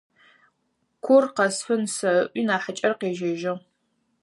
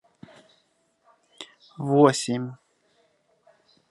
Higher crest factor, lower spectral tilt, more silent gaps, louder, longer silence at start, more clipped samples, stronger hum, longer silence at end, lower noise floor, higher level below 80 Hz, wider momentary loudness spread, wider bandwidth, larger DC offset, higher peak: second, 18 dB vs 24 dB; second, -4 dB/octave vs -5.5 dB/octave; neither; about the same, -23 LUFS vs -23 LUFS; second, 1.05 s vs 1.4 s; neither; neither; second, 0.65 s vs 1.35 s; first, -73 dBFS vs -68 dBFS; about the same, -78 dBFS vs -76 dBFS; second, 10 LU vs 25 LU; about the same, 11.5 kHz vs 11.5 kHz; neither; about the same, -6 dBFS vs -4 dBFS